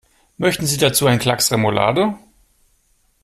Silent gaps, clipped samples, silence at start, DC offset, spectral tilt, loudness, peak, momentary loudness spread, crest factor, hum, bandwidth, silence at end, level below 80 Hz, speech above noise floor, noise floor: none; under 0.1%; 0.4 s; under 0.1%; -4 dB/octave; -17 LUFS; -2 dBFS; 6 LU; 18 dB; none; 16 kHz; 1.05 s; -50 dBFS; 44 dB; -61 dBFS